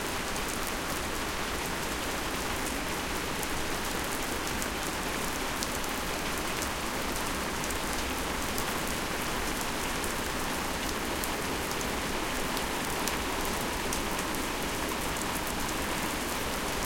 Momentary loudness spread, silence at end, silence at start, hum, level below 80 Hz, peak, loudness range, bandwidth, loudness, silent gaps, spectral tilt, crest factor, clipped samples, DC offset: 1 LU; 0 s; 0 s; none; -42 dBFS; -6 dBFS; 1 LU; 17 kHz; -31 LUFS; none; -2.5 dB/octave; 26 dB; under 0.1%; under 0.1%